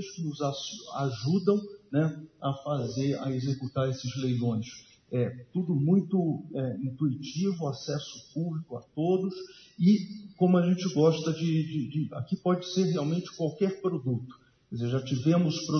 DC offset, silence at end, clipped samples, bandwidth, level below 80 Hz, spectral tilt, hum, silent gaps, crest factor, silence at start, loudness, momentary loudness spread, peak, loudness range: under 0.1%; 0 s; under 0.1%; 6.6 kHz; -70 dBFS; -7 dB/octave; none; none; 18 dB; 0 s; -29 LUFS; 11 LU; -12 dBFS; 4 LU